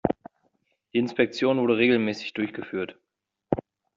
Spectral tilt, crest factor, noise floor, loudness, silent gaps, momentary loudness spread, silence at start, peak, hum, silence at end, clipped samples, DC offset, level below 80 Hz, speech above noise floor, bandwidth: -6.5 dB/octave; 22 dB; -82 dBFS; -26 LUFS; none; 12 LU; 0.05 s; -4 dBFS; none; 0.35 s; under 0.1%; under 0.1%; -58 dBFS; 57 dB; 7.6 kHz